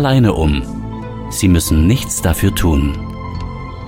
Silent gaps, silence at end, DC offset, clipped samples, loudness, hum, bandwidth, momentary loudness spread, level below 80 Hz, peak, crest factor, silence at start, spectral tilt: none; 0 s; under 0.1%; under 0.1%; -16 LUFS; none; 17 kHz; 13 LU; -22 dBFS; 0 dBFS; 14 dB; 0 s; -5.5 dB/octave